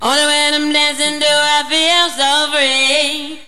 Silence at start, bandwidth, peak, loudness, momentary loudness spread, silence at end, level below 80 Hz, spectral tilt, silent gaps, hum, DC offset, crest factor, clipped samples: 0 s; 14.5 kHz; 0 dBFS; -12 LUFS; 3 LU; 0.05 s; -58 dBFS; 0.5 dB/octave; none; none; 2%; 14 dB; under 0.1%